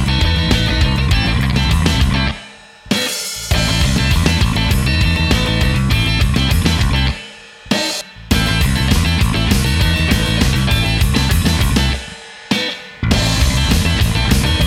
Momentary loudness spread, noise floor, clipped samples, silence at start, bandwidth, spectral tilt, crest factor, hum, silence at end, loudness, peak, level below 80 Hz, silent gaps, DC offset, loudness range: 6 LU; -38 dBFS; under 0.1%; 0 s; 16.5 kHz; -4.5 dB/octave; 14 dB; none; 0 s; -15 LUFS; 0 dBFS; -20 dBFS; none; under 0.1%; 2 LU